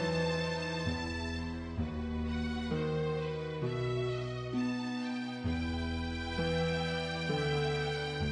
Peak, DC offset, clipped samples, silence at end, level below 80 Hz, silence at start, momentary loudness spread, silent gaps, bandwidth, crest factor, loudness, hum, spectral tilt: -22 dBFS; under 0.1%; under 0.1%; 0 s; -46 dBFS; 0 s; 5 LU; none; 10 kHz; 14 dB; -35 LUFS; none; -6 dB/octave